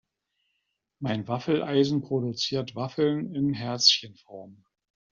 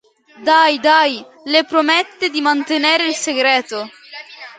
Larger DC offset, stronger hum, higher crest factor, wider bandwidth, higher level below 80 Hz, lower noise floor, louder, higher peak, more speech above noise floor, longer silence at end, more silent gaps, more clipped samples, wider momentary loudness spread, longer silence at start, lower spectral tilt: neither; neither; first, 24 dB vs 16 dB; second, 7.4 kHz vs 9.6 kHz; about the same, -68 dBFS vs -70 dBFS; first, -79 dBFS vs -35 dBFS; second, -26 LUFS vs -15 LUFS; second, -4 dBFS vs 0 dBFS; first, 52 dB vs 20 dB; first, 0.6 s vs 0.05 s; neither; neither; first, 19 LU vs 15 LU; first, 1 s vs 0.4 s; first, -4 dB/octave vs -1 dB/octave